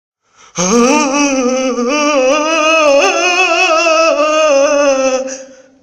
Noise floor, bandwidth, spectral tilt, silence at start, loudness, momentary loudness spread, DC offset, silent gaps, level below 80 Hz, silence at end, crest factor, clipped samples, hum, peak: -31 dBFS; 11.5 kHz; -2.5 dB/octave; 0.55 s; -11 LUFS; 6 LU; under 0.1%; none; -50 dBFS; 0.3 s; 12 dB; under 0.1%; none; 0 dBFS